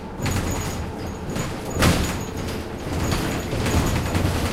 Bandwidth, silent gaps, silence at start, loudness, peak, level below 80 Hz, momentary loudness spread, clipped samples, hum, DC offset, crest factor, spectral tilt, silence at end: 16.5 kHz; none; 0 s; -24 LUFS; -6 dBFS; -32 dBFS; 9 LU; under 0.1%; none; under 0.1%; 18 dB; -5 dB/octave; 0 s